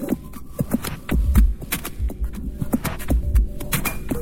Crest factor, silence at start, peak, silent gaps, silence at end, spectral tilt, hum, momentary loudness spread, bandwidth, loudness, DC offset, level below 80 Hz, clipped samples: 18 dB; 0 s; -2 dBFS; none; 0 s; -5.5 dB/octave; none; 10 LU; 17 kHz; -24 LUFS; under 0.1%; -24 dBFS; under 0.1%